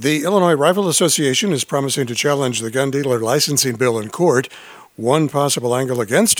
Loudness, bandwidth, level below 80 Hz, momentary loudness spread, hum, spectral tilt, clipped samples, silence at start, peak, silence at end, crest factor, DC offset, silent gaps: -17 LUFS; over 20 kHz; -66 dBFS; 5 LU; none; -3.5 dB/octave; under 0.1%; 0 s; 0 dBFS; 0 s; 16 dB; under 0.1%; none